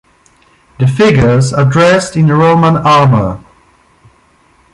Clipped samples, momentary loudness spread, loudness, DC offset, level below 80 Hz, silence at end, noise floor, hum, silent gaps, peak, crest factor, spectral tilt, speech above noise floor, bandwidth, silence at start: under 0.1%; 7 LU; -9 LUFS; under 0.1%; -36 dBFS; 1.35 s; -49 dBFS; none; none; 0 dBFS; 10 dB; -6.5 dB/octave; 41 dB; 11.5 kHz; 0.8 s